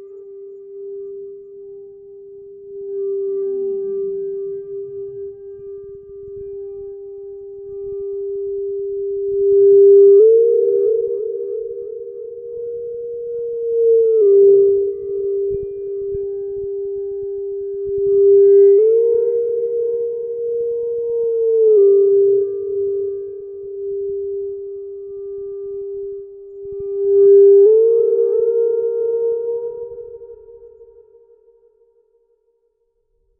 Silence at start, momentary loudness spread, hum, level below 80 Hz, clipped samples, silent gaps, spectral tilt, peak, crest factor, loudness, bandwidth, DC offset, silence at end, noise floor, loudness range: 0 s; 23 LU; none; -56 dBFS; under 0.1%; none; -14 dB/octave; -4 dBFS; 14 dB; -16 LUFS; 1.4 kHz; under 0.1%; 2.55 s; -66 dBFS; 15 LU